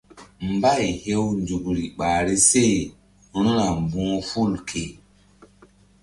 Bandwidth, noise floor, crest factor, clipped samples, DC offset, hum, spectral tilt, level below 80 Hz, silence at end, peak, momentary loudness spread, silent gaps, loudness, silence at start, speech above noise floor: 11.5 kHz; -54 dBFS; 18 dB; under 0.1%; under 0.1%; none; -4 dB/octave; -44 dBFS; 1.1 s; -4 dBFS; 14 LU; none; -22 LUFS; 0.15 s; 32 dB